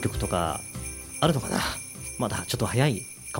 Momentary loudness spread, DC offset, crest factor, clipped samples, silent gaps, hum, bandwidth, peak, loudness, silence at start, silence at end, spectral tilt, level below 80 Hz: 11 LU; under 0.1%; 22 dB; under 0.1%; none; none; 16.5 kHz; -6 dBFS; -28 LUFS; 0 s; 0 s; -4.5 dB/octave; -44 dBFS